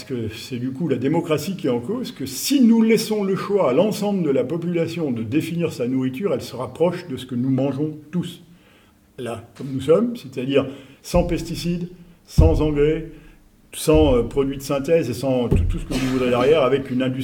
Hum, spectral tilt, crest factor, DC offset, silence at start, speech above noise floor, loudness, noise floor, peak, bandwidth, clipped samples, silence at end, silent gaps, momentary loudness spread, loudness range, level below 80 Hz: none; -6.5 dB/octave; 20 dB; under 0.1%; 0 s; 33 dB; -21 LUFS; -53 dBFS; -2 dBFS; 19.5 kHz; under 0.1%; 0 s; none; 12 LU; 5 LU; -32 dBFS